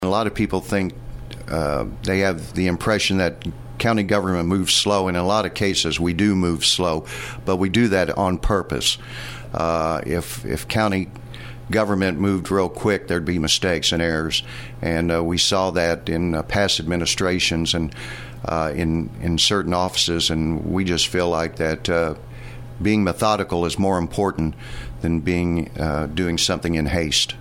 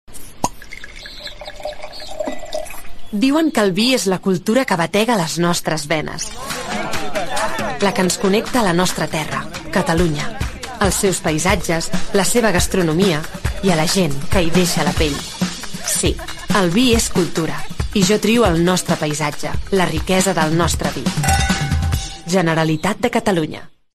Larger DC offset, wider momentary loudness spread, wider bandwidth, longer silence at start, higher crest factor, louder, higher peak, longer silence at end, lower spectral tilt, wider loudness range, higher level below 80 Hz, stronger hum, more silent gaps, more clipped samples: neither; about the same, 10 LU vs 12 LU; first, 16.5 kHz vs 13.5 kHz; about the same, 0 s vs 0.1 s; about the same, 16 dB vs 16 dB; second, -21 LUFS vs -18 LUFS; about the same, -4 dBFS vs -2 dBFS; second, 0 s vs 0.25 s; about the same, -4 dB/octave vs -4.5 dB/octave; about the same, 3 LU vs 3 LU; second, -38 dBFS vs -32 dBFS; neither; neither; neither